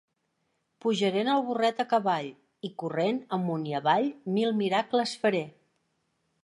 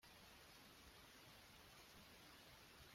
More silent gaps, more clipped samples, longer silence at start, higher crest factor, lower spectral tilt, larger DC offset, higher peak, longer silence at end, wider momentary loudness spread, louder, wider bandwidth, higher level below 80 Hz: neither; neither; first, 0.85 s vs 0 s; first, 20 dB vs 14 dB; first, -5.5 dB/octave vs -2.5 dB/octave; neither; first, -10 dBFS vs -50 dBFS; first, 0.95 s vs 0 s; first, 8 LU vs 1 LU; first, -28 LUFS vs -63 LUFS; second, 11.5 kHz vs 16 kHz; about the same, -80 dBFS vs -78 dBFS